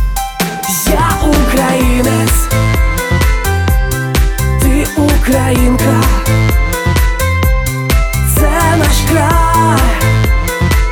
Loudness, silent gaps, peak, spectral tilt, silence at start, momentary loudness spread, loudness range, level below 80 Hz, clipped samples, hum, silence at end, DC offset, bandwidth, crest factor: -12 LUFS; none; 0 dBFS; -5 dB/octave; 0 s; 3 LU; 1 LU; -14 dBFS; under 0.1%; none; 0 s; under 0.1%; over 20 kHz; 10 dB